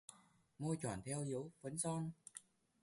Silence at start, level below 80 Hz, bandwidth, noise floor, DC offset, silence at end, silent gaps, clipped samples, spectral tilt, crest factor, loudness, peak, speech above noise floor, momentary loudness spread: 0.1 s; -74 dBFS; 11.5 kHz; -69 dBFS; under 0.1%; 0.45 s; none; under 0.1%; -5.5 dB/octave; 16 dB; -44 LUFS; -30 dBFS; 25 dB; 14 LU